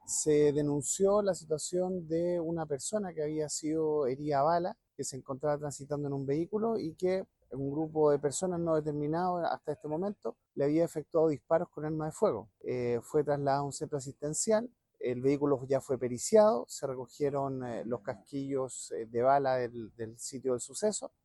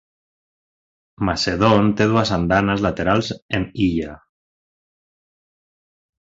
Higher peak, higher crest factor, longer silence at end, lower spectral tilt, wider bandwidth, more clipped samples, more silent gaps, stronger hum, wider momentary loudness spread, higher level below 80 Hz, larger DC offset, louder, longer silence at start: second, -14 dBFS vs -2 dBFS; about the same, 18 dB vs 20 dB; second, 0.15 s vs 2.15 s; about the same, -5.5 dB/octave vs -6 dB/octave; first, 12.5 kHz vs 7.8 kHz; neither; second, none vs 3.42-3.49 s; neither; about the same, 11 LU vs 9 LU; second, -66 dBFS vs -42 dBFS; neither; second, -32 LUFS vs -19 LUFS; second, 0.05 s vs 1.2 s